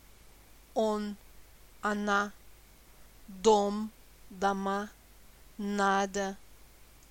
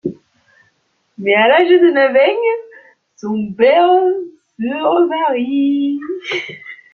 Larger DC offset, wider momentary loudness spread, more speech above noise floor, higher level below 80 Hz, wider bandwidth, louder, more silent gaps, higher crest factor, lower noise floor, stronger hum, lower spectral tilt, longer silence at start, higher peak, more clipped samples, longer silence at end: neither; first, 20 LU vs 15 LU; second, 26 dB vs 49 dB; first, -58 dBFS vs -64 dBFS; first, 17 kHz vs 6.6 kHz; second, -31 LUFS vs -14 LUFS; neither; first, 22 dB vs 14 dB; second, -56 dBFS vs -62 dBFS; neither; second, -4.5 dB/octave vs -6 dB/octave; first, 0.75 s vs 0.05 s; second, -12 dBFS vs 0 dBFS; neither; about the same, 0.25 s vs 0.2 s